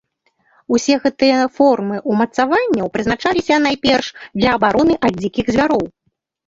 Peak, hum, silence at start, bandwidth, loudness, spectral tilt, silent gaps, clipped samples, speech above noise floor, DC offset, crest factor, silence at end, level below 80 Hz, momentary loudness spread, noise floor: -2 dBFS; none; 0.7 s; 7.8 kHz; -16 LUFS; -5 dB/octave; none; under 0.1%; 53 dB; under 0.1%; 14 dB; 0.6 s; -44 dBFS; 5 LU; -68 dBFS